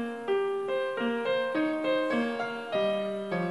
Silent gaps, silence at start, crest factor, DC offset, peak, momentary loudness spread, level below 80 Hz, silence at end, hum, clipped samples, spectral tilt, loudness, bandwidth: none; 0 s; 12 dB; under 0.1%; -16 dBFS; 4 LU; -82 dBFS; 0 s; none; under 0.1%; -6 dB/octave; -30 LUFS; 12 kHz